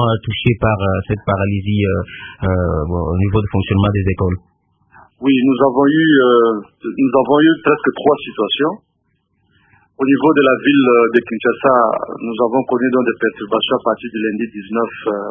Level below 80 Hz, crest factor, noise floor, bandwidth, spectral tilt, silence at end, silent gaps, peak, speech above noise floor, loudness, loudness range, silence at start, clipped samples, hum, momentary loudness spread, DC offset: -34 dBFS; 16 dB; -65 dBFS; 3.7 kHz; -10.5 dB/octave; 0 s; none; 0 dBFS; 50 dB; -15 LUFS; 4 LU; 0 s; under 0.1%; none; 9 LU; under 0.1%